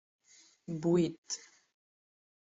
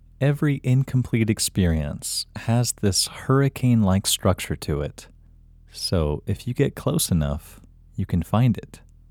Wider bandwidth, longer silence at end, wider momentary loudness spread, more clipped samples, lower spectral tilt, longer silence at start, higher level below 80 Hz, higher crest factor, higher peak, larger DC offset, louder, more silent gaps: second, 7.8 kHz vs 18 kHz; first, 1 s vs 0.35 s; first, 13 LU vs 8 LU; neither; about the same, -6 dB/octave vs -5 dB/octave; first, 0.7 s vs 0.2 s; second, -74 dBFS vs -38 dBFS; about the same, 18 dB vs 18 dB; second, -18 dBFS vs -4 dBFS; neither; second, -34 LUFS vs -23 LUFS; first, 1.18-1.23 s vs none